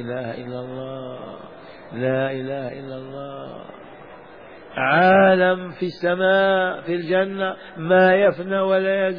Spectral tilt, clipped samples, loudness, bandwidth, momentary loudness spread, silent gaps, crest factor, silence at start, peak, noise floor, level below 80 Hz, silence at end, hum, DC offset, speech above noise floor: -8.5 dB/octave; under 0.1%; -19 LUFS; 5.2 kHz; 21 LU; none; 16 dB; 0 s; -6 dBFS; -42 dBFS; -62 dBFS; 0 s; none; 0.2%; 22 dB